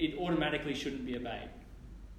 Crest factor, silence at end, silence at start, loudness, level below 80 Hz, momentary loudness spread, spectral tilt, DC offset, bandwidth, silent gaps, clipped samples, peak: 18 dB; 0 s; 0 s; -35 LUFS; -52 dBFS; 21 LU; -5.5 dB/octave; under 0.1%; 14 kHz; none; under 0.1%; -20 dBFS